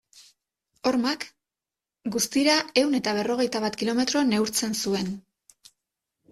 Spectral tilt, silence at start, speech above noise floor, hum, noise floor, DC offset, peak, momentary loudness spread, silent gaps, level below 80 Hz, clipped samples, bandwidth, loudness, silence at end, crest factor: -3 dB/octave; 0.15 s; 65 dB; none; -90 dBFS; under 0.1%; -8 dBFS; 11 LU; none; -64 dBFS; under 0.1%; 15 kHz; -25 LUFS; 1.1 s; 20 dB